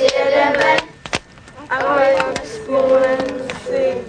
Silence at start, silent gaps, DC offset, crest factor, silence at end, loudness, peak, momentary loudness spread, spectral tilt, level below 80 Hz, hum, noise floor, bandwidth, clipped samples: 0 s; none; under 0.1%; 16 dB; 0 s; -17 LUFS; 0 dBFS; 11 LU; -3.5 dB/octave; -48 dBFS; none; -39 dBFS; 10 kHz; under 0.1%